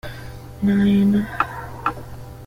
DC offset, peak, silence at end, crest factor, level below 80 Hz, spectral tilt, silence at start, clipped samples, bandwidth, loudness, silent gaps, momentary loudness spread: under 0.1%; -4 dBFS; 0 s; 18 dB; -42 dBFS; -8 dB/octave; 0.05 s; under 0.1%; 15 kHz; -20 LUFS; none; 20 LU